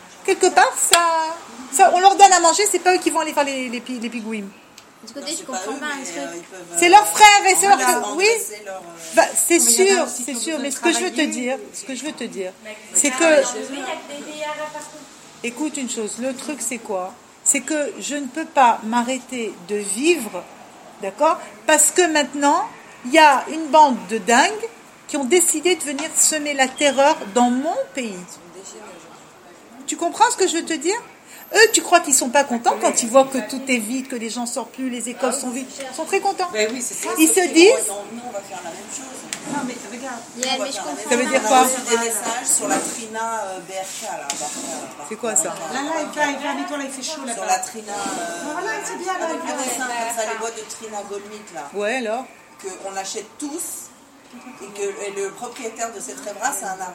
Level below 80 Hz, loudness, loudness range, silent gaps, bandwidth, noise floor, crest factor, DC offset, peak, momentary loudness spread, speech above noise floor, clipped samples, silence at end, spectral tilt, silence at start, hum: -66 dBFS; -19 LUFS; 12 LU; none; 16.5 kHz; -45 dBFS; 20 dB; under 0.1%; 0 dBFS; 17 LU; 25 dB; under 0.1%; 0 s; -1 dB/octave; 0 s; none